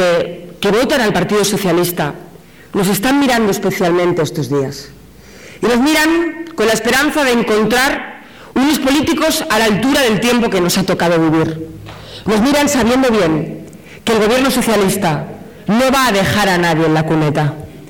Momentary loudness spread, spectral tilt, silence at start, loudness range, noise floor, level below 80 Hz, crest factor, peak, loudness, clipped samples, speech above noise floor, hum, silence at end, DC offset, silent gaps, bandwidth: 10 LU; -4.5 dB/octave; 0 s; 2 LU; -38 dBFS; -40 dBFS; 8 dB; -6 dBFS; -14 LUFS; under 0.1%; 25 dB; none; 0 s; 0.4%; none; over 20 kHz